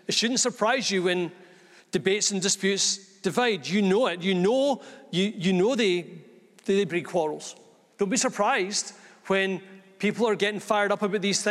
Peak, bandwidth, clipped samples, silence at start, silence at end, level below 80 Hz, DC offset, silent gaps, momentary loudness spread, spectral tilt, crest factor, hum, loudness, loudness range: -8 dBFS; 13.5 kHz; under 0.1%; 0.1 s; 0 s; -74 dBFS; under 0.1%; none; 8 LU; -3.5 dB/octave; 18 dB; none; -25 LUFS; 3 LU